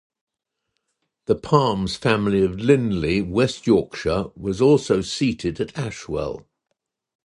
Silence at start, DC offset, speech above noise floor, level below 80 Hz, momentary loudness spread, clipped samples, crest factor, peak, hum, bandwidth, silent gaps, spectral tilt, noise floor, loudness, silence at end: 1.3 s; under 0.1%; 58 dB; -44 dBFS; 10 LU; under 0.1%; 20 dB; -2 dBFS; none; 11 kHz; none; -6 dB/octave; -78 dBFS; -21 LUFS; 0.85 s